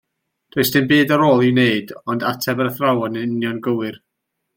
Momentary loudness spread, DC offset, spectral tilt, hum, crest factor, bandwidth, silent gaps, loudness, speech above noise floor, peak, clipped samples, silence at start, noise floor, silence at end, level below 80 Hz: 10 LU; under 0.1%; -5.5 dB/octave; none; 16 dB; 17 kHz; none; -18 LUFS; 38 dB; -2 dBFS; under 0.1%; 0.55 s; -55 dBFS; 0.6 s; -58 dBFS